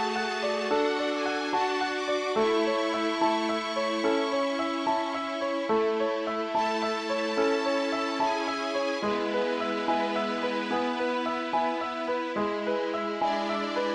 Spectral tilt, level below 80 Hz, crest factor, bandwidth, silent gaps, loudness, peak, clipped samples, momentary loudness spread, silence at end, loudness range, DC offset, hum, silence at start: -4 dB/octave; -68 dBFS; 14 dB; 11 kHz; none; -28 LUFS; -14 dBFS; under 0.1%; 3 LU; 0 s; 2 LU; under 0.1%; none; 0 s